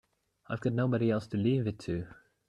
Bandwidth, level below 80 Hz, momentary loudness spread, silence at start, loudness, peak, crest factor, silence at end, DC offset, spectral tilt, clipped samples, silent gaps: 10 kHz; -62 dBFS; 10 LU; 0.5 s; -32 LUFS; -16 dBFS; 16 dB; 0.35 s; under 0.1%; -8.5 dB/octave; under 0.1%; none